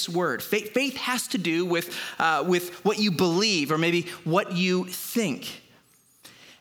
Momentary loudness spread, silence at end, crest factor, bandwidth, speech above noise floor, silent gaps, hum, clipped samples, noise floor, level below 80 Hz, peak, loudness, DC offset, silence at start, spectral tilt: 6 LU; 0.1 s; 18 dB; over 20 kHz; 34 dB; none; none; under 0.1%; -60 dBFS; -74 dBFS; -8 dBFS; -25 LUFS; under 0.1%; 0 s; -4 dB/octave